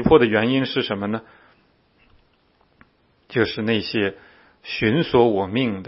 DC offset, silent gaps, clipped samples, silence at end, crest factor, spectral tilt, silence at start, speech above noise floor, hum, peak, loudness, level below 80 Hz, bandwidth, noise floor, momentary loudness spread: under 0.1%; none; under 0.1%; 0 s; 20 dB; -10.5 dB/octave; 0 s; 41 dB; none; -2 dBFS; -21 LUFS; -48 dBFS; 5.8 kHz; -61 dBFS; 11 LU